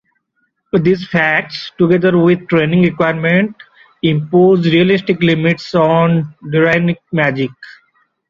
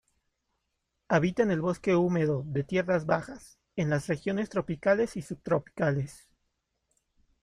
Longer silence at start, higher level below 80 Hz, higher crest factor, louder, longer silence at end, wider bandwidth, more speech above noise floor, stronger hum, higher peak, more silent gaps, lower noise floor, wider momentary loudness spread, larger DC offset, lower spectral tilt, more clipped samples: second, 0.75 s vs 1.1 s; first, -52 dBFS vs -60 dBFS; second, 12 dB vs 20 dB; first, -13 LUFS vs -29 LUFS; second, 0.6 s vs 1.25 s; second, 7 kHz vs 12 kHz; about the same, 53 dB vs 52 dB; neither; first, 0 dBFS vs -10 dBFS; neither; second, -65 dBFS vs -81 dBFS; about the same, 7 LU vs 8 LU; neither; about the same, -8 dB/octave vs -7 dB/octave; neither